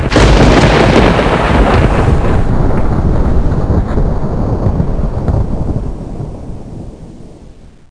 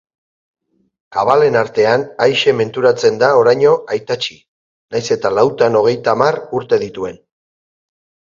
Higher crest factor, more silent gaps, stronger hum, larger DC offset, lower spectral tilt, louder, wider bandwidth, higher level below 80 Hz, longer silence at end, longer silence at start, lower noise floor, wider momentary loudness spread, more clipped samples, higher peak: second, 10 dB vs 16 dB; second, none vs 4.48-4.88 s; neither; first, 1% vs under 0.1%; first, -6.5 dB/octave vs -5 dB/octave; first, -11 LUFS vs -14 LUFS; first, 10.5 kHz vs 7.6 kHz; first, -14 dBFS vs -58 dBFS; second, 0.25 s vs 1.15 s; second, 0 s vs 1.1 s; second, -35 dBFS vs under -90 dBFS; first, 18 LU vs 11 LU; neither; about the same, 0 dBFS vs 0 dBFS